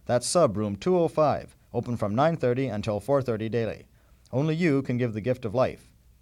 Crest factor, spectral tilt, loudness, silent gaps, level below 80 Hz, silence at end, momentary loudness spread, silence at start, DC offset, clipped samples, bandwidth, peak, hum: 16 dB; -6 dB/octave; -26 LUFS; none; -56 dBFS; 0.45 s; 9 LU; 0.1 s; under 0.1%; under 0.1%; 14.5 kHz; -10 dBFS; none